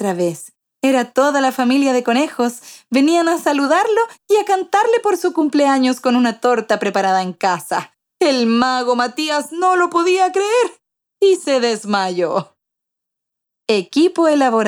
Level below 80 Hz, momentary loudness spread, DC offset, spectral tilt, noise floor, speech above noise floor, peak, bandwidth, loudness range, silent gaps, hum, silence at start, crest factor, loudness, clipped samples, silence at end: -72 dBFS; 6 LU; under 0.1%; -4 dB/octave; -81 dBFS; 65 dB; -2 dBFS; 19 kHz; 3 LU; none; none; 0 s; 16 dB; -16 LUFS; under 0.1%; 0 s